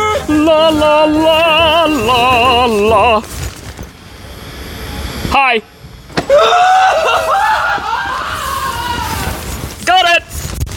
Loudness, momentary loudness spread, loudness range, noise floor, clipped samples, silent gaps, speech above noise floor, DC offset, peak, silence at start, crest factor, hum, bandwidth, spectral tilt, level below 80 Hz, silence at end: -11 LUFS; 17 LU; 5 LU; -35 dBFS; under 0.1%; none; 26 dB; under 0.1%; 0 dBFS; 0 s; 12 dB; none; 17 kHz; -4 dB/octave; -30 dBFS; 0 s